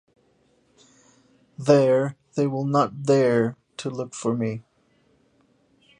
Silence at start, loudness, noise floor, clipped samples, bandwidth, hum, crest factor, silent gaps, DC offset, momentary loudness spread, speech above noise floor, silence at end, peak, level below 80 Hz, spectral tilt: 1.6 s; -23 LUFS; -63 dBFS; under 0.1%; 10.5 kHz; none; 22 dB; none; under 0.1%; 13 LU; 42 dB; 1.4 s; -4 dBFS; -68 dBFS; -6.5 dB/octave